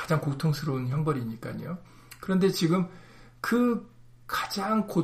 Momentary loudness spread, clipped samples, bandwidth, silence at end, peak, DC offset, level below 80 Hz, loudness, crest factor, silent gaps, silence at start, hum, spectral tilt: 12 LU; under 0.1%; 15.5 kHz; 0 s; -12 dBFS; under 0.1%; -58 dBFS; -28 LUFS; 16 dB; none; 0 s; none; -6.5 dB/octave